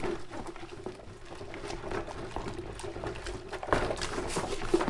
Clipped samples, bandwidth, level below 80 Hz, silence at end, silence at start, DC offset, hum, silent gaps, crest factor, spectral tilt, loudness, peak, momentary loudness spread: under 0.1%; 11.5 kHz; -44 dBFS; 0 s; 0 s; under 0.1%; none; none; 26 dB; -4.5 dB/octave; -37 LUFS; -8 dBFS; 13 LU